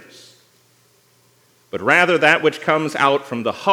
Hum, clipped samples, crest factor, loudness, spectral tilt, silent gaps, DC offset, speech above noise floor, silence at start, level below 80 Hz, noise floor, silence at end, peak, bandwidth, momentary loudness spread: 60 Hz at -55 dBFS; under 0.1%; 18 dB; -16 LUFS; -4.5 dB/octave; none; under 0.1%; 40 dB; 1.75 s; -72 dBFS; -57 dBFS; 0 s; 0 dBFS; 17 kHz; 11 LU